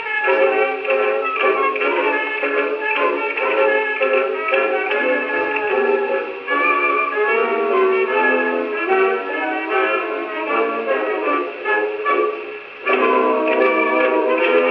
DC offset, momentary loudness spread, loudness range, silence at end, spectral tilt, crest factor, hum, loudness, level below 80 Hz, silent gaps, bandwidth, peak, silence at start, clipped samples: under 0.1%; 5 LU; 2 LU; 0 s; -5.5 dB/octave; 14 dB; none; -18 LUFS; -70 dBFS; none; 5.6 kHz; -4 dBFS; 0 s; under 0.1%